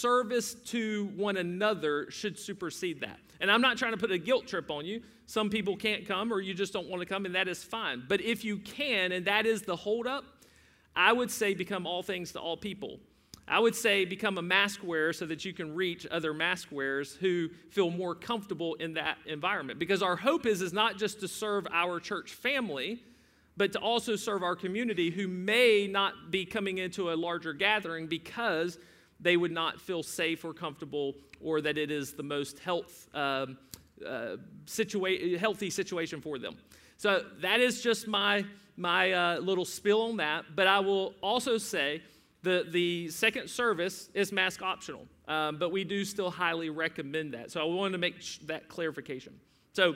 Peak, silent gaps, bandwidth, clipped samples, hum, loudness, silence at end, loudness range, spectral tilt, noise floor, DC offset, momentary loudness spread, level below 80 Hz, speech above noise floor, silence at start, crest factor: -8 dBFS; none; 16 kHz; under 0.1%; none; -31 LUFS; 0 s; 5 LU; -3.5 dB/octave; -62 dBFS; under 0.1%; 11 LU; -70 dBFS; 31 dB; 0 s; 22 dB